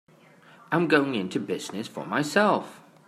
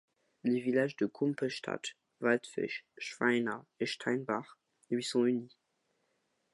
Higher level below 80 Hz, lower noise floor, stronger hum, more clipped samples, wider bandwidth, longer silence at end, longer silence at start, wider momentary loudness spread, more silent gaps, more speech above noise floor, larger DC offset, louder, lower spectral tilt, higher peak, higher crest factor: first, -74 dBFS vs -84 dBFS; second, -54 dBFS vs -79 dBFS; neither; neither; first, 14.5 kHz vs 11.5 kHz; second, 0.3 s vs 1.05 s; first, 0.7 s vs 0.45 s; first, 12 LU vs 8 LU; neither; second, 29 dB vs 46 dB; neither; first, -26 LUFS vs -34 LUFS; about the same, -5 dB/octave vs -5 dB/octave; first, -6 dBFS vs -14 dBFS; about the same, 22 dB vs 20 dB